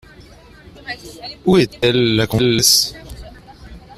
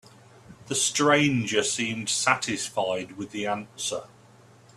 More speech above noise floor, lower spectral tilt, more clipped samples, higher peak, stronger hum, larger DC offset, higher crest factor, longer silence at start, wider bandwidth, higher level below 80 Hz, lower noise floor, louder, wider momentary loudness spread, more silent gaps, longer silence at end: about the same, 27 dB vs 28 dB; about the same, -3.5 dB/octave vs -3 dB/octave; neither; first, 0 dBFS vs -4 dBFS; neither; neither; about the same, 18 dB vs 22 dB; first, 0.85 s vs 0.5 s; first, 15.5 kHz vs 14 kHz; first, -42 dBFS vs -64 dBFS; second, -42 dBFS vs -54 dBFS; first, -14 LUFS vs -25 LUFS; first, 24 LU vs 11 LU; neither; second, 0.2 s vs 0.7 s